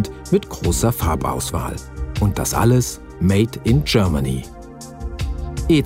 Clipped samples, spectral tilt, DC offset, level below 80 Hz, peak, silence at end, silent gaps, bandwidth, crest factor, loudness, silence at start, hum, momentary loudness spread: under 0.1%; -5.5 dB/octave; under 0.1%; -30 dBFS; -2 dBFS; 0 s; none; 16.5 kHz; 16 dB; -20 LUFS; 0 s; none; 13 LU